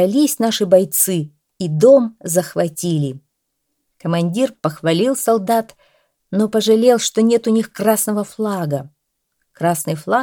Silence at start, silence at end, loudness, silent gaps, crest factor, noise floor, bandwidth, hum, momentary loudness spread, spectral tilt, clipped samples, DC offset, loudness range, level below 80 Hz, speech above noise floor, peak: 0 s; 0 s; -17 LUFS; none; 16 dB; -73 dBFS; 19 kHz; none; 11 LU; -5 dB/octave; under 0.1%; under 0.1%; 4 LU; -66 dBFS; 57 dB; 0 dBFS